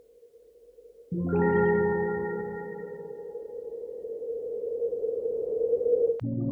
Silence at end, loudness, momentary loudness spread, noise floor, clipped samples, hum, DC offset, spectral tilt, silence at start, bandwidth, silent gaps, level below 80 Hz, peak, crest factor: 0 s; -29 LUFS; 15 LU; -56 dBFS; under 0.1%; none; under 0.1%; -11 dB/octave; 0.2 s; 3.3 kHz; none; -58 dBFS; -12 dBFS; 16 dB